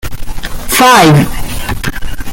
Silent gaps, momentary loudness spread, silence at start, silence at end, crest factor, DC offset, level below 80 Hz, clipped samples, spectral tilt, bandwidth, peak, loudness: none; 20 LU; 0.05 s; 0 s; 10 dB; under 0.1%; -22 dBFS; 0.3%; -4.5 dB/octave; 17.5 kHz; 0 dBFS; -9 LUFS